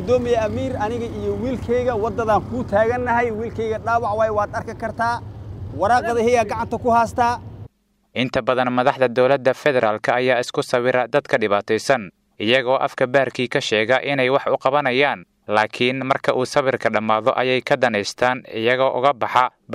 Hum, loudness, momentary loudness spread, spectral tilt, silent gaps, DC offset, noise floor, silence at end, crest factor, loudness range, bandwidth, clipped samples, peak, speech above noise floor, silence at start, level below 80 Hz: none; -20 LUFS; 7 LU; -5 dB/octave; none; under 0.1%; -51 dBFS; 0 s; 18 dB; 2 LU; 13.5 kHz; under 0.1%; -2 dBFS; 32 dB; 0 s; -46 dBFS